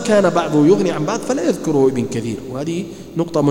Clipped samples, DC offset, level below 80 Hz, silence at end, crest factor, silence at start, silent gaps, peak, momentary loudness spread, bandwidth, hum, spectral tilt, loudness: under 0.1%; under 0.1%; -50 dBFS; 0 s; 14 dB; 0 s; none; -2 dBFS; 11 LU; 16.5 kHz; none; -6 dB/octave; -18 LUFS